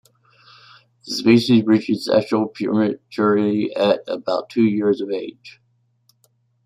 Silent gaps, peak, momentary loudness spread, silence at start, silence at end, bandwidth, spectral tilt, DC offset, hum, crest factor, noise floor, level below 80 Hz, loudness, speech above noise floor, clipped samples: none; -2 dBFS; 8 LU; 1.05 s; 1.15 s; 13 kHz; -6.5 dB/octave; under 0.1%; none; 18 dB; -63 dBFS; -64 dBFS; -19 LUFS; 45 dB; under 0.1%